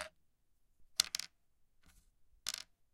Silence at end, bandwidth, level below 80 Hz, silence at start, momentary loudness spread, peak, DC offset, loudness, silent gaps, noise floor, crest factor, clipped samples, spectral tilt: 0.3 s; 16.5 kHz; -72 dBFS; 0 s; 15 LU; -8 dBFS; under 0.1%; -39 LUFS; none; -74 dBFS; 38 dB; under 0.1%; 2 dB/octave